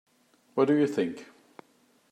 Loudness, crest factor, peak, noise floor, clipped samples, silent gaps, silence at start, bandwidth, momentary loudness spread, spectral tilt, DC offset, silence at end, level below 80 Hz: -27 LUFS; 18 dB; -12 dBFS; -65 dBFS; under 0.1%; none; 0.55 s; 10.5 kHz; 13 LU; -7 dB/octave; under 0.1%; 0.85 s; -82 dBFS